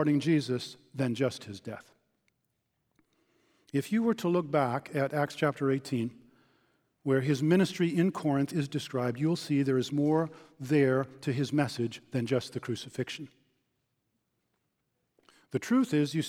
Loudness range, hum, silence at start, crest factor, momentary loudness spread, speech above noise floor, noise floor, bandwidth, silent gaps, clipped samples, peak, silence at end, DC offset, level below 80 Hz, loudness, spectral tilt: 8 LU; none; 0 s; 18 dB; 12 LU; 50 dB; -79 dBFS; 16 kHz; none; under 0.1%; -12 dBFS; 0 s; under 0.1%; -76 dBFS; -30 LUFS; -6.5 dB/octave